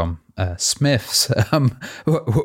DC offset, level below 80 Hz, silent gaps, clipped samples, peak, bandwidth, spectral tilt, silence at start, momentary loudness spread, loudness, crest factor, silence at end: under 0.1%; -44 dBFS; none; under 0.1%; -4 dBFS; 16.5 kHz; -4.5 dB/octave; 0 s; 9 LU; -19 LUFS; 16 dB; 0 s